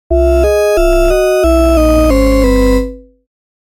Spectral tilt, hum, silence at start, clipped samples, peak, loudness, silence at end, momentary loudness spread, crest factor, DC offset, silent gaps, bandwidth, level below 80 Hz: -6.5 dB/octave; none; 0.1 s; under 0.1%; 0 dBFS; -10 LUFS; 0.7 s; 2 LU; 10 dB; under 0.1%; none; 17 kHz; -16 dBFS